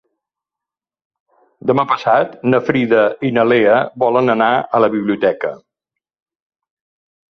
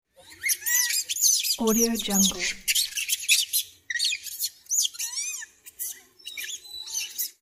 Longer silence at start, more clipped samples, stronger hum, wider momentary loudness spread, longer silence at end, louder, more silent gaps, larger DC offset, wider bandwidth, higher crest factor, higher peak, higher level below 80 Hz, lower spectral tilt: first, 1.65 s vs 0.25 s; neither; neither; second, 5 LU vs 14 LU; first, 1.75 s vs 0.15 s; first, -15 LUFS vs -24 LUFS; neither; neither; second, 6.4 kHz vs 16.5 kHz; about the same, 16 dB vs 20 dB; first, -2 dBFS vs -6 dBFS; about the same, -60 dBFS vs -58 dBFS; first, -8 dB/octave vs -1 dB/octave